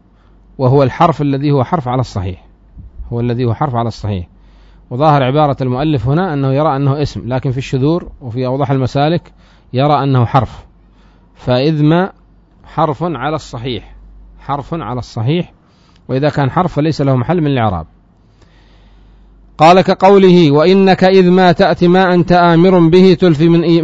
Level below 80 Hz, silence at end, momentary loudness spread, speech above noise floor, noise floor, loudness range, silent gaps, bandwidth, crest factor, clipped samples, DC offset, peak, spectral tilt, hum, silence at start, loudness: -38 dBFS; 0 s; 14 LU; 36 dB; -47 dBFS; 10 LU; none; 7.8 kHz; 12 dB; 0.1%; under 0.1%; 0 dBFS; -8 dB/octave; none; 0.6 s; -12 LUFS